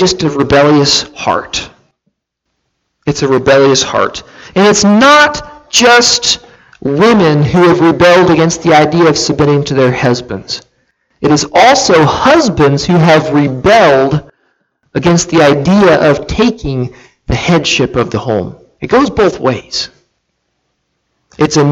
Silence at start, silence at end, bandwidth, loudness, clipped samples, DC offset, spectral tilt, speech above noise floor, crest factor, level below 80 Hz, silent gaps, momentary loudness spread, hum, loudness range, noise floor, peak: 0 s; 0 s; 16 kHz; -9 LUFS; under 0.1%; under 0.1%; -4.5 dB/octave; 61 dB; 10 dB; -36 dBFS; none; 12 LU; none; 5 LU; -69 dBFS; 0 dBFS